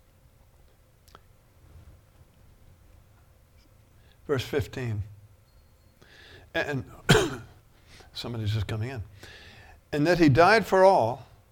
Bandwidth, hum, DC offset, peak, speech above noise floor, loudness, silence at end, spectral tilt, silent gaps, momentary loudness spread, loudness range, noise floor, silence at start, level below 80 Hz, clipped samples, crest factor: 18.5 kHz; none; under 0.1%; -4 dBFS; 34 dB; -25 LUFS; 0.3 s; -5.5 dB/octave; none; 23 LU; 12 LU; -58 dBFS; 4.3 s; -50 dBFS; under 0.1%; 26 dB